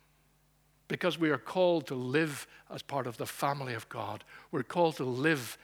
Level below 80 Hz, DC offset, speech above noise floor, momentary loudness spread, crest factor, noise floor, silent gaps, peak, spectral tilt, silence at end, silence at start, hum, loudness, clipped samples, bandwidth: -74 dBFS; under 0.1%; 36 dB; 12 LU; 20 dB; -68 dBFS; none; -14 dBFS; -5.5 dB/octave; 0.1 s; 0.9 s; none; -32 LUFS; under 0.1%; over 20 kHz